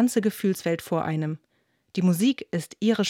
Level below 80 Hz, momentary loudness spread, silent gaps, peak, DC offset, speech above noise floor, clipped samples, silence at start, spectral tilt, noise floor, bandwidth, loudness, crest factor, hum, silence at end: -70 dBFS; 10 LU; none; -10 dBFS; under 0.1%; 46 dB; under 0.1%; 0 s; -6 dB/octave; -70 dBFS; 17 kHz; -26 LUFS; 14 dB; none; 0 s